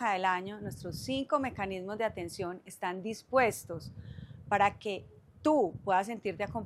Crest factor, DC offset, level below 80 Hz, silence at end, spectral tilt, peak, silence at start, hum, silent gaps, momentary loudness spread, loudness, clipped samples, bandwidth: 20 dB; under 0.1%; -62 dBFS; 0 s; -5 dB/octave; -14 dBFS; 0 s; none; none; 14 LU; -33 LUFS; under 0.1%; 15 kHz